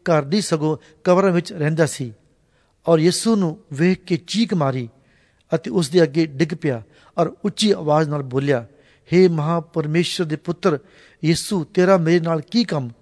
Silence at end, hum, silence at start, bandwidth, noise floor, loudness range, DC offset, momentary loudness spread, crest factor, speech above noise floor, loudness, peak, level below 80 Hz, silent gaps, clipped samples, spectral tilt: 0.1 s; none; 0.05 s; 11 kHz; -61 dBFS; 2 LU; under 0.1%; 9 LU; 18 dB; 42 dB; -20 LUFS; -2 dBFS; -58 dBFS; none; under 0.1%; -6 dB/octave